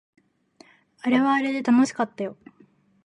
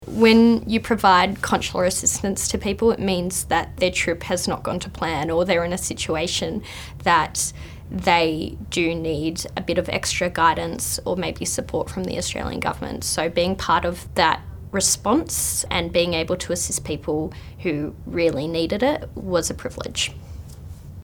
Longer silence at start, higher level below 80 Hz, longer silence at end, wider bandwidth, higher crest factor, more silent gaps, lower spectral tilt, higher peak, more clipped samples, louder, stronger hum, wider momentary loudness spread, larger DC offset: first, 1.05 s vs 0 s; second, -76 dBFS vs -40 dBFS; first, 0.7 s vs 0 s; second, 10.5 kHz vs 20 kHz; second, 16 dB vs 22 dB; neither; first, -5 dB/octave vs -3.5 dB/octave; second, -8 dBFS vs 0 dBFS; neither; about the same, -23 LUFS vs -22 LUFS; neither; about the same, 12 LU vs 10 LU; neither